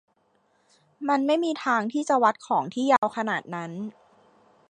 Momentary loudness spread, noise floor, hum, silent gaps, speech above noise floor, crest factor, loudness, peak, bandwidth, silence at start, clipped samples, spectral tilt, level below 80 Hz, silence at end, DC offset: 12 LU; -67 dBFS; none; 2.98-3.02 s; 43 dB; 20 dB; -25 LUFS; -6 dBFS; 10 kHz; 1 s; under 0.1%; -5 dB/octave; -80 dBFS; 0.8 s; under 0.1%